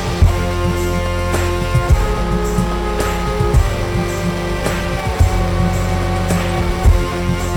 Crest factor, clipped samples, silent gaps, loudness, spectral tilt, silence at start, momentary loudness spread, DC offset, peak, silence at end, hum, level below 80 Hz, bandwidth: 14 dB; under 0.1%; none; -17 LUFS; -6 dB/octave; 0 s; 4 LU; under 0.1%; -2 dBFS; 0 s; none; -20 dBFS; 18.5 kHz